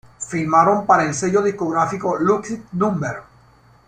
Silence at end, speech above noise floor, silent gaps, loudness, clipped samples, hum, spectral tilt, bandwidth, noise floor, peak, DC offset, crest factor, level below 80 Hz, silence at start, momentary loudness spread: 0.65 s; 33 dB; none; -19 LUFS; under 0.1%; none; -6 dB/octave; 9.6 kHz; -51 dBFS; -2 dBFS; under 0.1%; 18 dB; -56 dBFS; 0.2 s; 12 LU